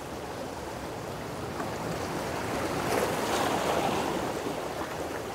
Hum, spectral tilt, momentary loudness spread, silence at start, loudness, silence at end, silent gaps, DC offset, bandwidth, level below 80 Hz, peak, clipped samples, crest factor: none; -4.5 dB/octave; 9 LU; 0 s; -32 LUFS; 0 s; none; under 0.1%; 16 kHz; -52 dBFS; -14 dBFS; under 0.1%; 18 dB